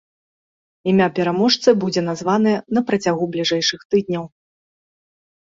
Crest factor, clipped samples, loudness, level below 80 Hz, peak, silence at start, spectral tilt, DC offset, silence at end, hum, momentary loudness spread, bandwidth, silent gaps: 18 dB; under 0.1%; -19 LUFS; -60 dBFS; -2 dBFS; 0.85 s; -5 dB/octave; under 0.1%; 1.15 s; none; 7 LU; 7.8 kHz; 3.85-3.90 s